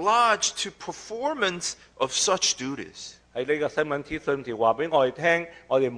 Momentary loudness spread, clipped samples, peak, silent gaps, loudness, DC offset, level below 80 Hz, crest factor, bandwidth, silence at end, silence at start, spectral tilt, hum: 13 LU; under 0.1%; -6 dBFS; none; -25 LUFS; under 0.1%; -60 dBFS; 18 dB; 10.5 kHz; 0 s; 0 s; -2 dB/octave; none